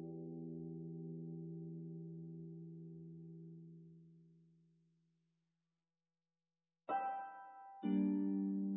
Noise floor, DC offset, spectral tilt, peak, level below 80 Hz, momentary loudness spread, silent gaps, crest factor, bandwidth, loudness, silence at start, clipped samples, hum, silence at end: under -90 dBFS; under 0.1%; -6.5 dB/octave; -28 dBFS; -86 dBFS; 19 LU; none; 18 dB; 3.7 kHz; -45 LUFS; 0 s; under 0.1%; none; 0 s